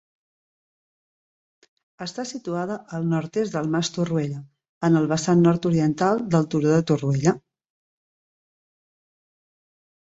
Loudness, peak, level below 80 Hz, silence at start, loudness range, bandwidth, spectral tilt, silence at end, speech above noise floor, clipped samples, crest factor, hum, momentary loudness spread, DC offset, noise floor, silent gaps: -23 LUFS; -6 dBFS; -62 dBFS; 2 s; 9 LU; 8 kHz; -6.5 dB/octave; 2.7 s; over 68 dB; under 0.1%; 20 dB; none; 12 LU; under 0.1%; under -90 dBFS; 4.69-4.81 s